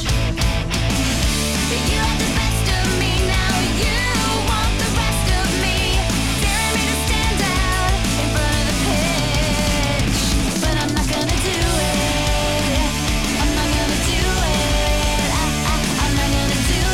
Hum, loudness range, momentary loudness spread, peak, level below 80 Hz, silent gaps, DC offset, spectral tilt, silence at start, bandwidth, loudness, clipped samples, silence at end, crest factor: none; 0 LU; 1 LU; -6 dBFS; -24 dBFS; none; 1%; -3.5 dB/octave; 0 s; 16.5 kHz; -18 LUFS; under 0.1%; 0 s; 12 dB